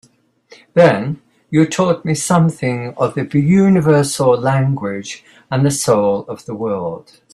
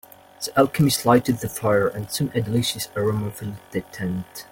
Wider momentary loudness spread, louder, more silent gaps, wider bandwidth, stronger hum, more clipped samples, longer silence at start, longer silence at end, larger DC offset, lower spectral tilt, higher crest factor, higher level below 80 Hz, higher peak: about the same, 14 LU vs 13 LU; first, -15 LUFS vs -23 LUFS; neither; second, 13.5 kHz vs 17 kHz; neither; neither; first, 0.75 s vs 0.4 s; first, 0.35 s vs 0.05 s; neither; about the same, -6 dB/octave vs -5 dB/octave; about the same, 16 dB vs 20 dB; about the same, -52 dBFS vs -54 dBFS; about the same, 0 dBFS vs -2 dBFS